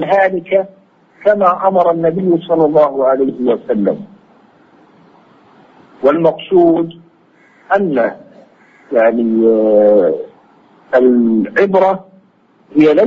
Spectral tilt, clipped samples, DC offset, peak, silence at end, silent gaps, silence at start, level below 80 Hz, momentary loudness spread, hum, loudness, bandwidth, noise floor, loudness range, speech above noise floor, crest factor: -8.5 dB/octave; under 0.1%; under 0.1%; 0 dBFS; 0 s; none; 0 s; -58 dBFS; 8 LU; none; -13 LUFS; 6.4 kHz; -51 dBFS; 4 LU; 40 dB; 14 dB